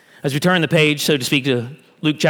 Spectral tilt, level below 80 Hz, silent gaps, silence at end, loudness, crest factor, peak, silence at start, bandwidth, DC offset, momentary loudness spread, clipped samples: -4.5 dB/octave; -64 dBFS; none; 0 s; -17 LUFS; 16 dB; -2 dBFS; 0.25 s; over 20 kHz; under 0.1%; 8 LU; under 0.1%